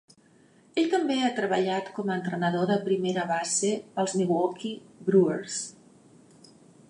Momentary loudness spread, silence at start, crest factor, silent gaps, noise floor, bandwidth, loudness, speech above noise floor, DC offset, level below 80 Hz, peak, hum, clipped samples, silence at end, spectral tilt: 10 LU; 0.75 s; 18 dB; none; -59 dBFS; 11.5 kHz; -27 LUFS; 33 dB; under 0.1%; -78 dBFS; -10 dBFS; none; under 0.1%; 1.2 s; -4.5 dB/octave